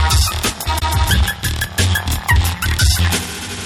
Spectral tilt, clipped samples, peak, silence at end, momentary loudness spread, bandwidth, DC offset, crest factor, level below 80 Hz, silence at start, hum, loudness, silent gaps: -3 dB/octave; under 0.1%; -2 dBFS; 0 s; 5 LU; 17 kHz; under 0.1%; 14 dB; -20 dBFS; 0 s; none; -16 LUFS; none